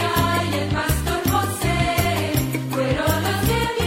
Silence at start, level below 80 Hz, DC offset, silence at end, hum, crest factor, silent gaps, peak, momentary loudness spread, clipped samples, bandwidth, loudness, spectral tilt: 0 s; -32 dBFS; under 0.1%; 0 s; none; 16 dB; none; -4 dBFS; 3 LU; under 0.1%; 16.5 kHz; -21 LUFS; -5 dB/octave